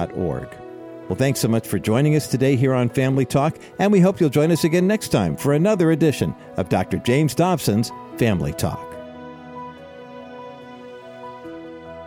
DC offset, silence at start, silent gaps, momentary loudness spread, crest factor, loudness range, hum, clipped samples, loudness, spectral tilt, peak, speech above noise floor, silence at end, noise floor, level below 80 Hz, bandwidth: under 0.1%; 0 s; none; 20 LU; 14 dB; 10 LU; none; under 0.1%; -20 LUFS; -6.5 dB/octave; -6 dBFS; 20 dB; 0 s; -39 dBFS; -48 dBFS; 17 kHz